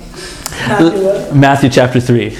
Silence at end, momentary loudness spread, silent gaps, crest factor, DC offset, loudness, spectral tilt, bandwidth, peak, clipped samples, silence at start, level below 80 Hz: 0 s; 14 LU; none; 12 dB; under 0.1%; -10 LUFS; -6 dB/octave; 15.5 kHz; 0 dBFS; 0.5%; 0 s; -38 dBFS